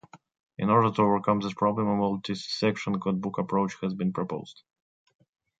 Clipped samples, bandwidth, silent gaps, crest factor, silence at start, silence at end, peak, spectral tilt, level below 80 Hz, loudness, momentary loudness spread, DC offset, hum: under 0.1%; 7.8 kHz; 0.40-0.47 s; 20 dB; 0.15 s; 1.05 s; -8 dBFS; -7 dB/octave; -64 dBFS; -27 LUFS; 10 LU; under 0.1%; none